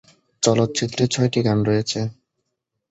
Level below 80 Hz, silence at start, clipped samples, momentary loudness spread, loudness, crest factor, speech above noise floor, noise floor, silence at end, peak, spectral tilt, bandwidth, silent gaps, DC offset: -54 dBFS; 0.4 s; under 0.1%; 7 LU; -21 LUFS; 18 dB; 58 dB; -78 dBFS; 0.8 s; -2 dBFS; -5 dB/octave; 8.2 kHz; none; under 0.1%